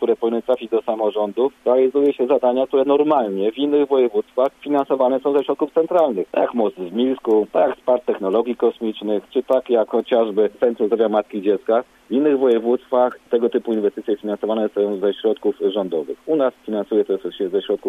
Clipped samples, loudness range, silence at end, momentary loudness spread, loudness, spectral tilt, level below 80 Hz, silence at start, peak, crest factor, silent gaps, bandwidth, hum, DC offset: under 0.1%; 3 LU; 0 s; 6 LU; -19 LUFS; -7.5 dB/octave; -66 dBFS; 0 s; -4 dBFS; 14 dB; none; 3.9 kHz; none; under 0.1%